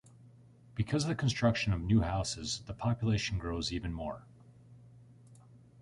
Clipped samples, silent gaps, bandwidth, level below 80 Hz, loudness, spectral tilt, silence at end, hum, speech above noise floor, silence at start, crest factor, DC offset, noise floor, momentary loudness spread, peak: under 0.1%; none; 11.5 kHz; -48 dBFS; -33 LUFS; -5.5 dB/octave; 0.25 s; none; 26 dB; 0.25 s; 18 dB; under 0.1%; -58 dBFS; 10 LU; -16 dBFS